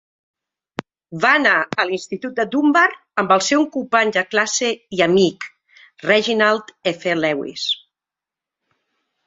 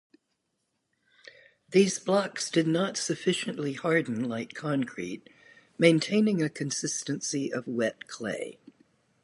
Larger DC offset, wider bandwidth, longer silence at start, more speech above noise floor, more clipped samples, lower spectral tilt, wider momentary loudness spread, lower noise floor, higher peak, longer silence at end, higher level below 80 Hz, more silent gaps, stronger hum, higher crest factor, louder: neither; second, 8 kHz vs 11.5 kHz; second, 0.8 s vs 1.25 s; first, 70 dB vs 51 dB; neither; about the same, -3.5 dB/octave vs -4.5 dB/octave; about the same, 13 LU vs 11 LU; first, -88 dBFS vs -79 dBFS; first, 0 dBFS vs -8 dBFS; first, 1.5 s vs 0.7 s; first, -64 dBFS vs -76 dBFS; neither; neither; about the same, 20 dB vs 22 dB; first, -18 LUFS vs -28 LUFS